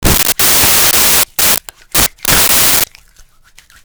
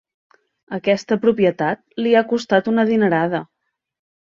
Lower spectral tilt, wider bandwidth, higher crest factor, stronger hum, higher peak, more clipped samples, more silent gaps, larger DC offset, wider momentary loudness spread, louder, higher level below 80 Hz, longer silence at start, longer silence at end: second, -1 dB/octave vs -6.5 dB/octave; first, over 20 kHz vs 7.4 kHz; second, 10 dB vs 18 dB; neither; about the same, 0 dBFS vs -2 dBFS; neither; neither; neither; about the same, 6 LU vs 7 LU; first, -7 LUFS vs -18 LUFS; first, -28 dBFS vs -62 dBFS; second, 0 s vs 0.7 s; about the same, 1 s vs 0.9 s